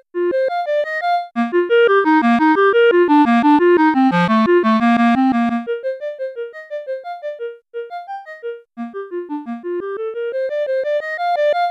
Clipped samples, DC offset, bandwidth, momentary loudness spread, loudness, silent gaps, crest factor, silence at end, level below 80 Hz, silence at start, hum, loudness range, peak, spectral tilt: under 0.1%; under 0.1%; 8.6 kHz; 17 LU; -16 LUFS; none; 12 dB; 0 s; -60 dBFS; 0.15 s; none; 15 LU; -4 dBFS; -7 dB/octave